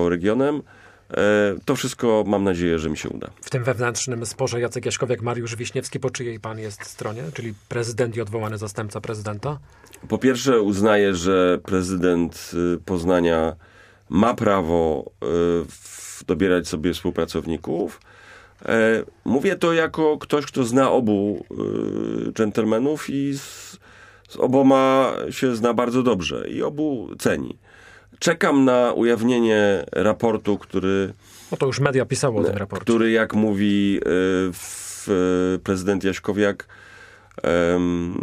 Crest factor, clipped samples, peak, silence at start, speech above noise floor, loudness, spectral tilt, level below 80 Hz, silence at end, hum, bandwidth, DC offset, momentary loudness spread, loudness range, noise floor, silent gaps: 22 dB; under 0.1%; 0 dBFS; 0 s; 27 dB; -21 LUFS; -5.5 dB/octave; -50 dBFS; 0 s; none; 15.5 kHz; under 0.1%; 12 LU; 6 LU; -48 dBFS; none